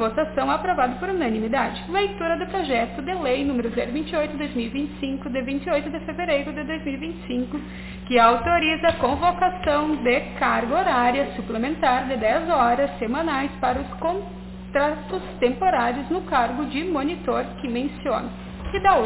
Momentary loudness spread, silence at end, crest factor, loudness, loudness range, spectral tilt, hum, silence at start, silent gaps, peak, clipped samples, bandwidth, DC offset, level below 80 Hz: 9 LU; 0 s; 20 dB; -23 LUFS; 5 LU; -9.5 dB/octave; none; 0 s; none; -2 dBFS; under 0.1%; 4 kHz; under 0.1%; -42 dBFS